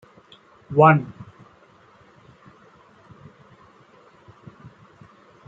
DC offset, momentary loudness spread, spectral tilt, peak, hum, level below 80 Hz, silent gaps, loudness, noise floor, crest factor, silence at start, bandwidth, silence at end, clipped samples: under 0.1%; 30 LU; -9.5 dB/octave; -2 dBFS; none; -66 dBFS; none; -17 LUFS; -54 dBFS; 24 dB; 0.7 s; 4.1 kHz; 4.35 s; under 0.1%